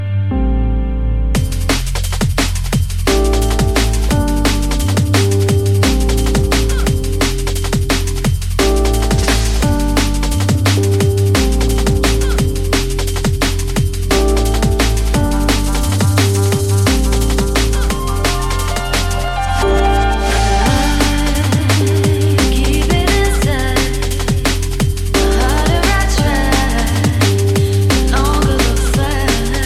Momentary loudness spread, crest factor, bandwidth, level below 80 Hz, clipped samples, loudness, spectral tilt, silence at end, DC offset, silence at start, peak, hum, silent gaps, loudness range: 4 LU; 14 dB; 15.5 kHz; -18 dBFS; under 0.1%; -15 LUFS; -5 dB/octave; 0 s; 2%; 0 s; 0 dBFS; none; none; 2 LU